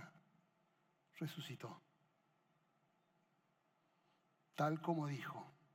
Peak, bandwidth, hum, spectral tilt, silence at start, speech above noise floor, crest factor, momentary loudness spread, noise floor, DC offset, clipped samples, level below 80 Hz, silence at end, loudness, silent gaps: -26 dBFS; 16.5 kHz; none; -6.5 dB/octave; 0 s; 37 dB; 22 dB; 20 LU; -81 dBFS; under 0.1%; under 0.1%; under -90 dBFS; 0.25 s; -45 LUFS; none